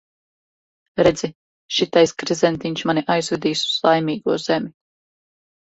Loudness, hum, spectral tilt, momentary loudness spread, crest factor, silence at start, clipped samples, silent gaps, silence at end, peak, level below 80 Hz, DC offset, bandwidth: -20 LUFS; none; -4.5 dB/octave; 7 LU; 20 dB; 0.95 s; under 0.1%; 1.35-1.69 s; 1 s; -2 dBFS; -54 dBFS; under 0.1%; 8.2 kHz